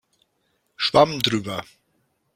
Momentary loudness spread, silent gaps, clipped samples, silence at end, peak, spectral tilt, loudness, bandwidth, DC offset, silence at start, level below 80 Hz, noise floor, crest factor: 14 LU; none; under 0.1%; 0.75 s; -2 dBFS; -4.5 dB/octave; -21 LUFS; 16.5 kHz; under 0.1%; 0.8 s; -58 dBFS; -70 dBFS; 22 dB